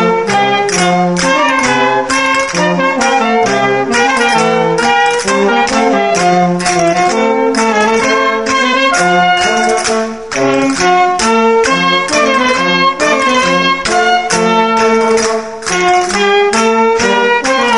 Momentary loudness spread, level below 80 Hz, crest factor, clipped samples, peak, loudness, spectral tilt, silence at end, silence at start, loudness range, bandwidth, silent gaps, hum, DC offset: 2 LU; -44 dBFS; 10 dB; under 0.1%; 0 dBFS; -10 LUFS; -3.5 dB/octave; 0 s; 0 s; 1 LU; 11.5 kHz; none; none; 0.7%